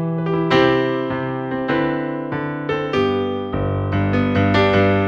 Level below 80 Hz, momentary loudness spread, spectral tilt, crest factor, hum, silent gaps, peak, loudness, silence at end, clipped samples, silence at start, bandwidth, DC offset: -42 dBFS; 8 LU; -8 dB/octave; 16 dB; none; none; -2 dBFS; -19 LUFS; 0 s; under 0.1%; 0 s; 7 kHz; under 0.1%